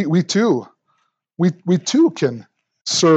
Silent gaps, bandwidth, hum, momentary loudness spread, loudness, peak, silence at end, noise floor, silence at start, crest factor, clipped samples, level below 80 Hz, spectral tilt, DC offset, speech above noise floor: 2.81-2.85 s; 8.8 kHz; none; 7 LU; -18 LUFS; -2 dBFS; 0 s; -67 dBFS; 0 s; 16 dB; under 0.1%; -74 dBFS; -5 dB/octave; under 0.1%; 50 dB